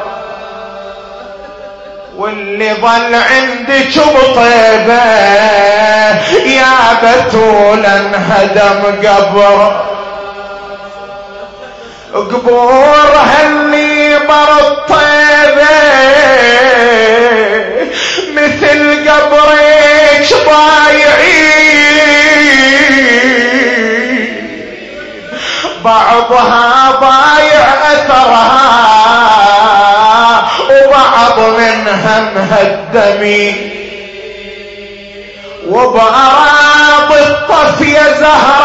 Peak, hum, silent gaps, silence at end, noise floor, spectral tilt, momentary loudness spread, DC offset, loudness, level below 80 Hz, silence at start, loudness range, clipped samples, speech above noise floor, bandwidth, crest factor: 0 dBFS; none; none; 0 s; -28 dBFS; -3 dB/octave; 19 LU; 0.6%; -6 LUFS; -38 dBFS; 0 s; 7 LU; 0.7%; 22 dB; 11 kHz; 6 dB